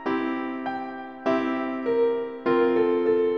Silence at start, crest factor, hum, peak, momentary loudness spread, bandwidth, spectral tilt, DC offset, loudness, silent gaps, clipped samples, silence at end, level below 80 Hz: 0 s; 14 dB; none; -10 dBFS; 9 LU; 6.2 kHz; -7 dB/octave; 0.1%; -25 LUFS; none; under 0.1%; 0 s; -66 dBFS